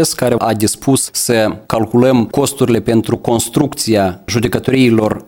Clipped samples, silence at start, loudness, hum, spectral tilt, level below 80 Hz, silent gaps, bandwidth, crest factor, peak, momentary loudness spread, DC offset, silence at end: under 0.1%; 0 s; -14 LUFS; none; -5 dB/octave; -42 dBFS; none; 18 kHz; 12 dB; 0 dBFS; 5 LU; under 0.1%; 0.05 s